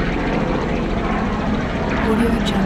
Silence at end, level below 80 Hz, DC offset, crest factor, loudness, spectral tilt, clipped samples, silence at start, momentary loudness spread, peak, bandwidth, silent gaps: 0 s; -28 dBFS; under 0.1%; 14 dB; -20 LUFS; -6.5 dB/octave; under 0.1%; 0 s; 4 LU; -4 dBFS; 13 kHz; none